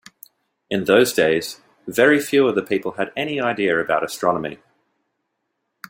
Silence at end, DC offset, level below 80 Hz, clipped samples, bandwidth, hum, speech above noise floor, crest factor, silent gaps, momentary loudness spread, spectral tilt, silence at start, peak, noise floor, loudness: 1.35 s; under 0.1%; -62 dBFS; under 0.1%; 16.5 kHz; none; 56 dB; 20 dB; none; 10 LU; -4.5 dB/octave; 0.7 s; -2 dBFS; -75 dBFS; -19 LUFS